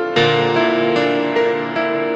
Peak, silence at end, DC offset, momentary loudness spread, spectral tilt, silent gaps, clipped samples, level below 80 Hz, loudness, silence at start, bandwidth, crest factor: -2 dBFS; 0 s; under 0.1%; 5 LU; -6 dB/octave; none; under 0.1%; -58 dBFS; -16 LUFS; 0 s; 8 kHz; 16 dB